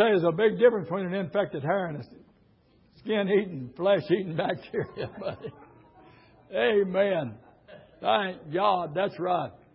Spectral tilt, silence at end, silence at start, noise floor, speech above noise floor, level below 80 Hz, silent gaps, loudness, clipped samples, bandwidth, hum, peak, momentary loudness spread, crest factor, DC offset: -10 dB/octave; 0.2 s; 0 s; -62 dBFS; 36 dB; -66 dBFS; none; -27 LUFS; under 0.1%; 5.6 kHz; none; -8 dBFS; 14 LU; 20 dB; under 0.1%